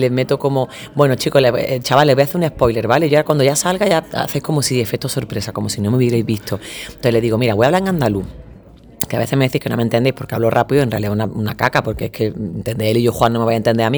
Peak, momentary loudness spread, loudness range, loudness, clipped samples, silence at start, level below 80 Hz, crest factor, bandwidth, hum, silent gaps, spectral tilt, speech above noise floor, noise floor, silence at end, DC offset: 0 dBFS; 8 LU; 4 LU; -17 LUFS; under 0.1%; 0 s; -42 dBFS; 16 dB; over 20 kHz; none; none; -5.5 dB/octave; 25 dB; -41 dBFS; 0 s; under 0.1%